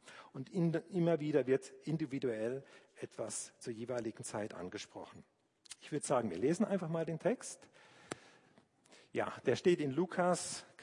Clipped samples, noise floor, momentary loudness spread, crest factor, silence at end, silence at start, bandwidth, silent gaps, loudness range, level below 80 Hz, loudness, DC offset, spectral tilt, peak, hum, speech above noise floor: under 0.1%; -68 dBFS; 16 LU; 20 dB; 0 s; 0.05 s; 11 kHz; none; 6 LU; -82 dBFS; -37 LUFS; under 0.1%; -5.5 dB/octave; -18 dBFS; none; 31 dB